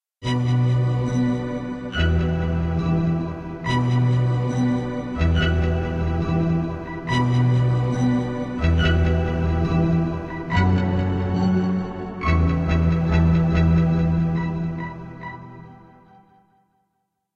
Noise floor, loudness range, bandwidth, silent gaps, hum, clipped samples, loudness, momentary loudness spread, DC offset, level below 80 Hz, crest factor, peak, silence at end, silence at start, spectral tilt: -74 dBFS; 2 LU; 7.4 kHz; none; none; under 0.1%; -22 LUFS; 9 LU; under 0.1%; -30 dBFS; 14 dB; -6 dBFS; 1.6 s; 0.2 s; -8 dB/octave